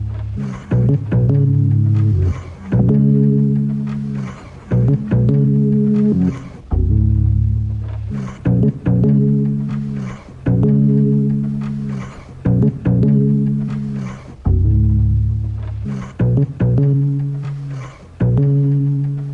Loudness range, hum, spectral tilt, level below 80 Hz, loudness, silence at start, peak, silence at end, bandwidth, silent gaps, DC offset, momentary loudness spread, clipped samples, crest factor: 3 LU; none; -11 dB/octave; -28 dBFS; -17 LUFS; 0 s; -4 dBFS; 0 s; 3.6 kHz; none; under 0.1%; 12 LU; under 0.1%; 12 dB